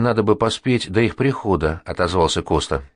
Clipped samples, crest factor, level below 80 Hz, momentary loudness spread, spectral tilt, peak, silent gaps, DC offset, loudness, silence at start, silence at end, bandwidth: under 0.1%; 16 dB; -36 dBFS; 3 LU; -5.5 dB/octave; -4 dBFS; none; under 0.1%; -19 LUFS; 0 s; 0.1 s; 10.5 kHz